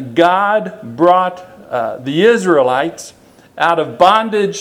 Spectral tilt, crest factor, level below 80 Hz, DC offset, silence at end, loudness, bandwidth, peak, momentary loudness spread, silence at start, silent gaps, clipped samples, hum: -5 dB/octave; 14 dB; -58 dBFS; under 0.1%; 0 s; -13 LUFS; 15.5 kHz; 0 dBFS; 12 LU; 0 s; none; 0.1%; none